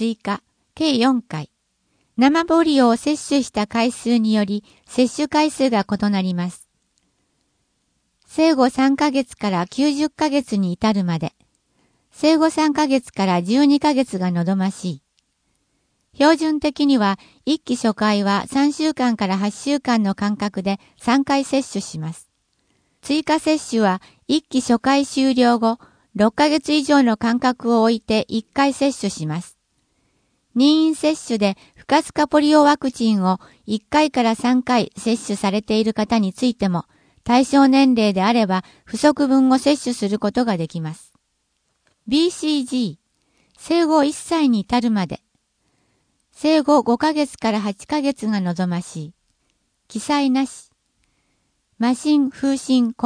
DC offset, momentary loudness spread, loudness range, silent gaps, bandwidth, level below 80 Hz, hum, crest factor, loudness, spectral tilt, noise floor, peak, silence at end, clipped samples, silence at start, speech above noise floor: under 0.1%; 11 LU; 5 LU; none; 10.5 kHz; -56 dBFS; none; 20 dB; -19 LUFS; -5 dB/octave; -70 dBFS; 0 dBFS; 0 s; under 0.1%; 0 s; 52 dB